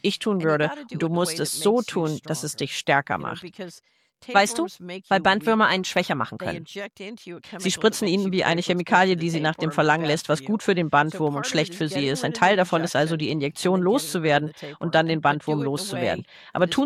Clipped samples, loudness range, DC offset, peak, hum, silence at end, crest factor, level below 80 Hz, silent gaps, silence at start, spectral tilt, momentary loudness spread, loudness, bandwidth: under 0.1%; 3 LU; under 0.1%; -4 dBFS; none; 0 s; 20 dB; -64 dBFS; none; 0.05 s; -4.5 dB/octave; 12 LU; -23 LUFS; 15.5 kHz